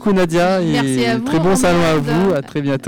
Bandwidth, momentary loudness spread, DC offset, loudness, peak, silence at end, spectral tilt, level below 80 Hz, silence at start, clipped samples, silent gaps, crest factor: 18.5 kHz; 4 LU; under 0.1%; -15 LUFS; -10 dBFS; 0 s; -5.5 dB/octave; -38 dBFS; 0 s; under 0.1%; none; 6 dB